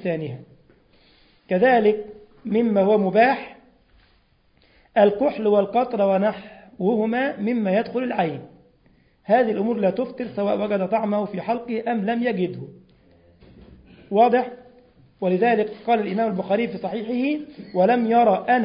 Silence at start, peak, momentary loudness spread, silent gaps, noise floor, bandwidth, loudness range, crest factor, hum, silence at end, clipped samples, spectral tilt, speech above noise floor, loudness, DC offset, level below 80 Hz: 0 s; -4 dBFS; 11 LU; none; -60 dBFS; 5.4 kHz; 4 LU; 18 dB; none; 0 s; under 0.1%; -11.5 dB/octave; 40 dB; -21 LUFS; under 0.1%; -62 dBFS